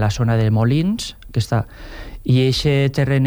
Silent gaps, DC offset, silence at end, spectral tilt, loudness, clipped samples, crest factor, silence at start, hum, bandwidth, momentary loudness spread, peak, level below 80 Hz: none; under 0.1%; 0 s; -6.5 dB/octave; -18 LUFS; under 0.1%; 12 dB; 0 s; none; over 20 kHz; 13 LU; -6 dBFS; -36 dBFS